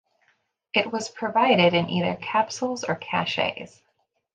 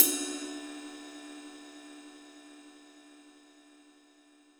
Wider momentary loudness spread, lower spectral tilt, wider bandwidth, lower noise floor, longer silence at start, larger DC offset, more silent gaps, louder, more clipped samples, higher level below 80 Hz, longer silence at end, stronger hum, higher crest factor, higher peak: second, 10 LU vs 21 LU; first, -4.5 dB/octave vs 0.5 dB/octave; second, 9.2 kHz vs over 20 kHz; first, -72 dBFS vs -62 dBFS; first, 0.75 s vs 0 s; neither; neither; first, -24 LUFS vs -34 LUFS; neither; first, -68 dBFS vs -80 dBFS; second, 0.65 s vs 1.3 s; neither; second, 20 dB vs 34 dB; about the same, -4 dBFS vs -2 dBFS